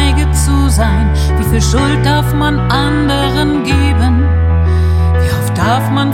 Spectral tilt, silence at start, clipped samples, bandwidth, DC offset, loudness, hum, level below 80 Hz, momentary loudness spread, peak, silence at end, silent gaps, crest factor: -5.5 dB/octave; 0 s; under 0.1%; 15.5 kHz; under 0.1%; -12 LUFS; none; -16 dBFS; 2 LU; 0 dBFS; 0 s; none; 10 dB